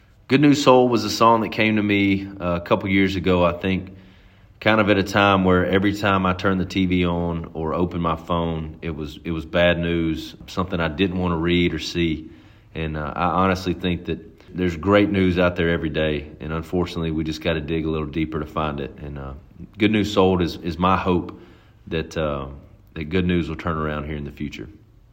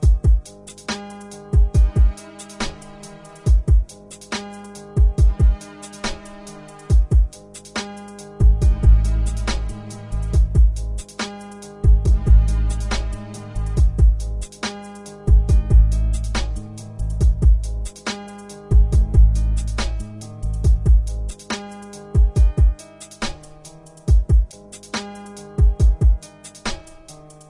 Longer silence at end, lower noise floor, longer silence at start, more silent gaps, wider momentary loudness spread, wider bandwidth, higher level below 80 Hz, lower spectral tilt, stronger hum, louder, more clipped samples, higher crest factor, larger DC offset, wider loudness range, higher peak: about the same, 0.4 s vs 0.35 s; first, -49 dBFS vs -42 dBFS; first, 0.3 s vs 0 s; neither; second, 14 LU vs 20 LU; first, 16.5 kHz vs 11.5 kHz; second, -44 dBFS vs -18 dBFS; about the same, -6.5 dB/octave vs -6 dB/octave; second, none vs 50 Hz at -30 dBFS; about the same, -21 LUFS vs -20 LUFS; neither; first, 20 dB vs 14 dB; neither; first, 6 LU vs 2 LU; first, 0 dBFS vs -4 dBFS